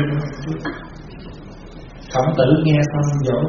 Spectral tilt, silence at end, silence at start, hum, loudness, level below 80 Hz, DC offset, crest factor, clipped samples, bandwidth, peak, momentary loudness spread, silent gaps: -7 dB/octave; 0 s; 0 s; none; -19 LUFS; -40 dBFS; under 0.1%; 18 dB; under 0.1%; 7.2 kHz; -2 dBFS; 23 LU; none